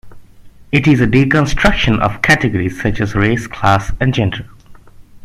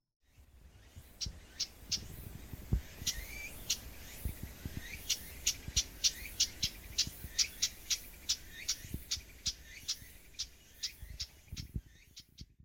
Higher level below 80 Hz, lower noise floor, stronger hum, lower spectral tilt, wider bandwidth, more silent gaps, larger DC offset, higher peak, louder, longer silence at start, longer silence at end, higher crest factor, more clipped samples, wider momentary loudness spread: first, -28 dBFS vs -50 dBFS; second, -38 dBFS vs -60 dBFS; neither; first, -6 dB/octave vs -1 dB/octave; second, 14.5 kHz vs 17 kHz; neither; neither; first, 0 dBFS vs -16 dBFS; first, -14 LUFS vs -37 LUFS; second, 0.05 s vs 0.4 s; about the same, 0.05 s vs 0.1 s; second, 14 dB vs 26 dB; neither; second, 6 LU vs 16 LU